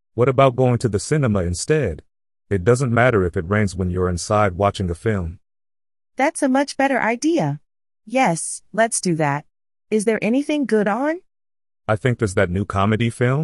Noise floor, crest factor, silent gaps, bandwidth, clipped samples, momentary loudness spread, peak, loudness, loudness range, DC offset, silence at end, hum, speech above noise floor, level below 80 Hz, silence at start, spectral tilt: under -90 dBFS; 18 dB; none; 12 kHz; under 0.1%; 9 LU; -2 dBFS; -20 LUFS; 2 LU; under 0.1%; 0 s; none; over 71 dB; -38 dBFS; 0.15 s; -6 dB/octave